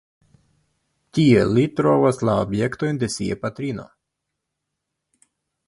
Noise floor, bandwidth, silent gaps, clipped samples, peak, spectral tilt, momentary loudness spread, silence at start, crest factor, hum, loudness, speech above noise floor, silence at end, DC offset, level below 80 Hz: -80 dBFS; 11.5 kHz; none; under 0.1%; -2 dBFS; -6.5 dB/octave; 12 LU; 1.15 s; 20 dB; none; -20 LUFS; 61 dB; 1.8 s; under 0.1%; -50 dBFS